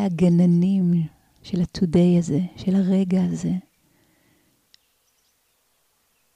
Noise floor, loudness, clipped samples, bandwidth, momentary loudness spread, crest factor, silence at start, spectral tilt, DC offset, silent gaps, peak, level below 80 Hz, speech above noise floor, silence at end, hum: -67 dBFS; -21 LUFS; under 0.1%; 9 kHz; 10 LU; 12 dB; 0 s; -8.5 dB/octave; under 0.1%; none; -10 dBFS; -52 dBFS; 47 dB; 2.75 s; none